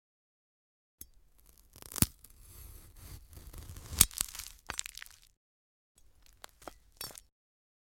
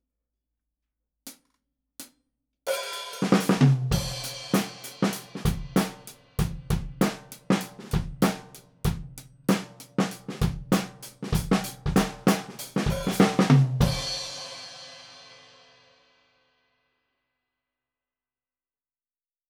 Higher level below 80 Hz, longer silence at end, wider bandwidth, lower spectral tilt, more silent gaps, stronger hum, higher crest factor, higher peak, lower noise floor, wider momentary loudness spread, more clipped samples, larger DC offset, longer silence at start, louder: second, -52 dBFS vs -42 dBFS; second, 0.8 s vs 4.15 s; second, 17 kHz vs over 20 kHz; second, -2 dB/octave vs -5.5 dB/octave; first, 5.37-5.95 s vs none; neither; first, 38 dB vs 22 dB; first, -2 dBFS vs -6 dBFS; second, -62 dBFS vs under -90 dBFS; first, 27 LU vs 21 LU; neither; neither; first, 1.75 s vs 1.25 s; second, -32 LUFS vs -27 LUFS